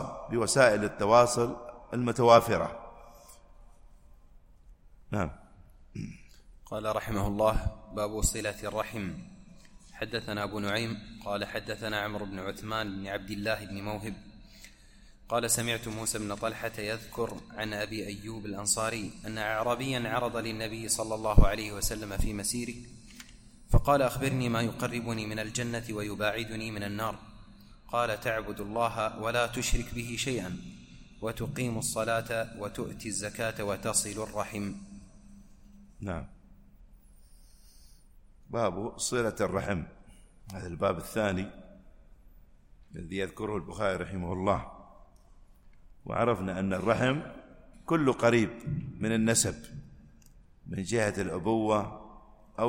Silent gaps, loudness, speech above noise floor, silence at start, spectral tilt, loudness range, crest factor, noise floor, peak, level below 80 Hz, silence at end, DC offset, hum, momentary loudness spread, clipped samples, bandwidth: none; -31 LUFS; 26 dB; 0 s; -4.5 dB/octave; 7 LU; 26 dB; -56 dBFS; -4 dBFS; -42 dBFS; 0 s; under 0.1%; none; 16 LU; under 0.1%; 16.5 kHz